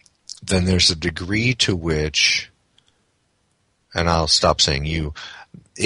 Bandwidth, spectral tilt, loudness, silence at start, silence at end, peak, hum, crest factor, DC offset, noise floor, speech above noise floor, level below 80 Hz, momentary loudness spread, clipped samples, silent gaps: 11.5 kHz; -3.5 dB/octave; -18 LUFS; 0.3 s; 0 s; -2 dBFS; none; 20 dB; under 0.1%; -66 dBFS; 47 dB; -36 dBFS; 18 LU; under 0.1%; none